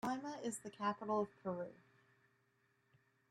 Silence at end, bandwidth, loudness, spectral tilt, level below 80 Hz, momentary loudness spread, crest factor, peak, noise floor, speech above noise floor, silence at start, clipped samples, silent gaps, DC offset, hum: 1.55 s; 13 kHz; -43 LUFS; -5 dB/octave; -84 dBFS; 7 LU; 20 dB; -26 dBFS; -79 dBFS; 36 dB; 0.05 s; under 0.1%; none; under 0.1%; none